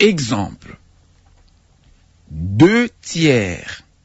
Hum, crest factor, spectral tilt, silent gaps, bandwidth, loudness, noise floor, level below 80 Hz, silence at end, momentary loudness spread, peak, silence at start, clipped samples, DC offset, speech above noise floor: none; 16 dB; -5.5 dB/octave; none; 8 kHz; -16 LUFS; -52 dBFS; -46 dBFS; 0.25 s; 17 LU; -2 dBFS; 0 s; under 0.1%; under 0.1%; 36 dB